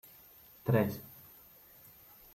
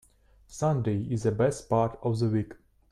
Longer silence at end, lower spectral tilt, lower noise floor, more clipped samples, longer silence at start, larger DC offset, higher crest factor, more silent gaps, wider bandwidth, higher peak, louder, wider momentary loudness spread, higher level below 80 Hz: first, 1.25 s vs 0.35 s; about the same, -8 dB/octave vs -7.5 dB/octave; about the same, -58 dBFS vs -58 dBFS; neither; first, 0.65 s vs 0.5 s; neither; first, 22 dB vs 16 dB; neither; first, 16.5 kHz vs 12 kHz; second, -16 dBFS vs -12 dBFS; second, -33 LUFS vs -28 LUFS; first, 24 LU vs 5 LU; second, -70 dBFS vs -54 dBFS